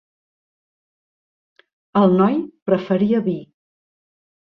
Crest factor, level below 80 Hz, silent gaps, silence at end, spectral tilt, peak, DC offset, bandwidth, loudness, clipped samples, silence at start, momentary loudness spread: 18 dB; -62 dBFS; 2.62-2.66 s; 1.15 s; -10 dB/octave; -4 dBFS; under 0.1%; 5.4 kHz; -19 LUFS; under 0.1%; 1.95 s; 10 LU